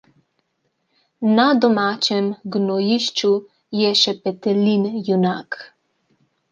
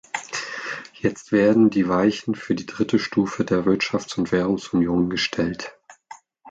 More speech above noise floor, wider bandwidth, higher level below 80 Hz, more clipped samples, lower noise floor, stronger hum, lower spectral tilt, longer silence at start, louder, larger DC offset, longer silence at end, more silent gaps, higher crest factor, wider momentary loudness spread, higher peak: first, 52 dB vs 25 dB; about the same, 9 kHz vs 9 kHz; second, -68 dBFS vs -52 dBFS; neither; first, -71 dBFS vs -46 dBFS; neither; about the same, -5 dB/octave vs -5.5 dB/octave; first, 1.2 s vs 0.15 s; first, -19 LUFS vs -22 LUFS; neither; first, 0.85 s vs 0 s; neither; about the same, 18 dB vs 16 dB; about the same, 9 LU vs 11 LU; first, -2 dBFS vs -6 dBFS